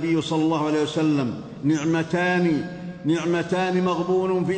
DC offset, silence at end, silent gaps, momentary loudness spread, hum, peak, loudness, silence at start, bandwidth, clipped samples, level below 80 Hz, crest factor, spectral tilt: under 0.1%; 0 s; none; 5 LU; none; -10 dBFS; -23 LUFS; 0 s; 9 kHz; under 0.1%; -58 dBFS; 14 dB; -6.5 dB/octave